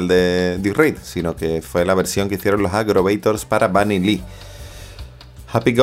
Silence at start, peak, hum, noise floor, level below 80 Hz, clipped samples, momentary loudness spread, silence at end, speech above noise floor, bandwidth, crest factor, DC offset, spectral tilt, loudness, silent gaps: 0 s; -2 dBFS; none; -38 dBFS; -40 dBFS; under 0.1%; 20 LU; 0 s; 21 dB; 16 kHz; 16 dB; under 0.1%; -5.5 dB/octave; -18 LUFS; none